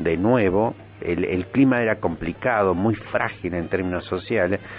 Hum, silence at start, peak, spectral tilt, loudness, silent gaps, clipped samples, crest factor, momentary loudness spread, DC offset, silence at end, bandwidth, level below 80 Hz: none; 0 s; -4 dBFS; -11.5 dB/octave; -22 LUFS; none; under 0.1%; 18 dB; 8 LU; under 0.1%; 0 s; 4.8 kHz; -46 dBFS